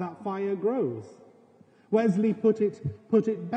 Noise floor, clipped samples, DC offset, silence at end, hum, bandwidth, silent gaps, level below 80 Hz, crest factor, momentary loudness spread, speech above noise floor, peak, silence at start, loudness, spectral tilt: -58 dBFS; under 0.1%; under 0.1%; 0 s; none; 8.6 kHz; none; -70 dBFS; 16 dB; 8 LU; 32 dB; -12 dBFS; 0 s; -27 LUFS; -9 dB/octave